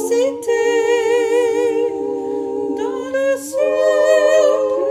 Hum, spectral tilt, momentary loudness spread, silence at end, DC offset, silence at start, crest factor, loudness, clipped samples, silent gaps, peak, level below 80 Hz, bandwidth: none; -3 dB/octave; 9 LU; 0 s; under 0.1%; 0 s; 14 dB; -17 LUFS; under 0.1%; none; -2 dBFS; -64 dBFS; 15.5 kHz